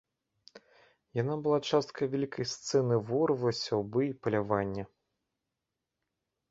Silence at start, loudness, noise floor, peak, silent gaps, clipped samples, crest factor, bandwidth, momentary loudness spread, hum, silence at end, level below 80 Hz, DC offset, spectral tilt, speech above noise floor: 0.55 s; -31 LUFS; -87 dBFS; -12 dBFS; none; under 0.1%; 20 dB; 7.8 kHz; 7 LU; none; 1.65 s; -66 dBFS; under 0.1%; -6 dB/octave; 57 dB